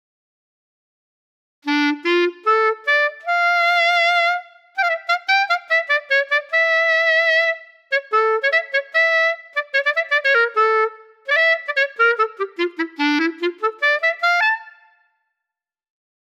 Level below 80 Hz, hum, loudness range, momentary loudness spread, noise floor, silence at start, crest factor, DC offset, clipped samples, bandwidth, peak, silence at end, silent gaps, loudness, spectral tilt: under -90 dBFS; none; 3 LU; 8 LU; -86 dBFS; 1.65 s; 14 dB; under 0.1%; under 0.1%; 14 kHz; -6 dBFS; 1.5 s; none; -17 LUFS; -0.5 dB/octave